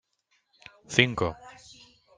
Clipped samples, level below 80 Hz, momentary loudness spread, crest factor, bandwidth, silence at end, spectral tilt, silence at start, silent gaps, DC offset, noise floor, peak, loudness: under 0.1%; -58 dBFS; 25 LU; 28 dB; 10 kHz; 0.65 s; -4 dB/octave; 0.9 s; none; under 0.1%; -73 dBFS; -2 dBFS; -25 LUFS